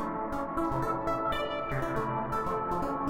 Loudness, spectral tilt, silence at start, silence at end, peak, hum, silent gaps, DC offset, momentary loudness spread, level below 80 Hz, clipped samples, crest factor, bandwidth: -32 LUFS; -7 dB/octave; 0 s; 0 s; -18 dBFS; none; none; under 0.1%; 2 LU; -46 dBFS; under 0.1%; 14 dB; 17 kHz